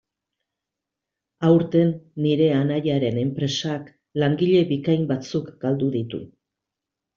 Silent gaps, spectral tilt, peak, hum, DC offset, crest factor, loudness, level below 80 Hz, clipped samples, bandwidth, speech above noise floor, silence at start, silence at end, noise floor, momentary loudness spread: none; -7 dB/octave; -4 dBFS; none; under 0.1%; 18 dB; -22 LUFS; -62 dBFS; under 0.1%; 7.2 kHz; 64 dB; 1.4 s; 0.9 s; -85 dBFS; 10 LU